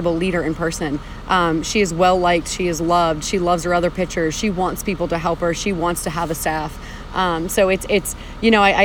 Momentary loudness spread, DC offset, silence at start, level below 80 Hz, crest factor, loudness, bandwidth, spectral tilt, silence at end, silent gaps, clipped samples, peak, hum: 7 LU; under 0.1%; 0 s; -34 dBFS; 16 dB; -19 LUFS; 20 kHz; -4.5 dB/octave; 0 s; none; under 0.1%; -2 dBFS; none